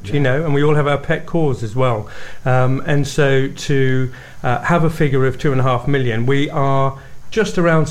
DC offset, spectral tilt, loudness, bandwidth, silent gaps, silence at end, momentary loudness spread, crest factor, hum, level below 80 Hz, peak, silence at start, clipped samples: 7%; -7 dB/octave; -17 LUFS; 13.5 kHz; none; 0 s; 6 LU; 14 dB; none; -38 dBFS; -4 dBFS; 0 s; under 0.1%